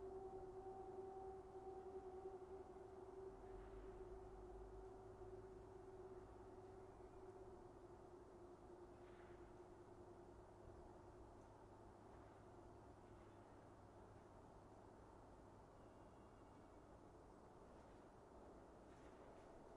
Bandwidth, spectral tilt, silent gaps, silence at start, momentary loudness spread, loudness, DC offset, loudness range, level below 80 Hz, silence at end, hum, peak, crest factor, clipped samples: 10.5 kHz; -7.5 dB/octave; none; 0 s; 9 LU; -61 LUFS; under 0.1%; 8 LU; -70 dBFS; 0 s; none; -44 dBFS; 16 dB; under 0.1%